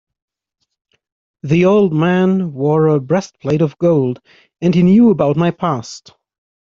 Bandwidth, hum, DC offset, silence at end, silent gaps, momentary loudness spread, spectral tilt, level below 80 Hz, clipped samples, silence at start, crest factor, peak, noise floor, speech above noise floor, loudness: 7.6 kHz; none; under 0.1%; 0.65 s; none; 12 LU; -8 dB/octave; -52 dBFS; under 0.1%; 1.45 s; 14 dB; 0 dBFS; -72 dBFS; 59 dB; -14 LUFS